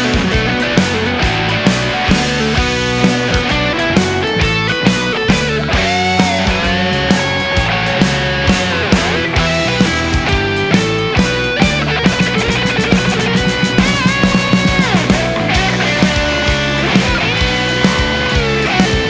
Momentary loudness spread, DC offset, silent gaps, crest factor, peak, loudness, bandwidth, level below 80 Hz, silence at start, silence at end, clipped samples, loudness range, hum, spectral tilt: 2 LU; 0.4%; none; 14 dB; 0 dBFS; -13 LUFS; 8 kHz; -26 dBFS; 0 s; 0 s; under 0.1%; 1 LU; none; -4.5 dB/octave